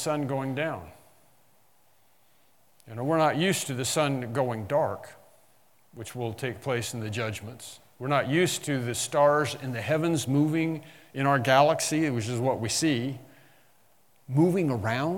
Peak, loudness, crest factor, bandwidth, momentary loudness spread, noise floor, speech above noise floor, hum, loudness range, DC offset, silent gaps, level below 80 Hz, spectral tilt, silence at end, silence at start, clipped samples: -6 dBFS; -27 LUFS; 22 dB; 18 kHz; 15 LU; -66 dBFS; 39 dB; none; 7 LU; under 0.1%; none; -70 dBFS; -5 dB/octave; 0 s; 0 s; under 0.1%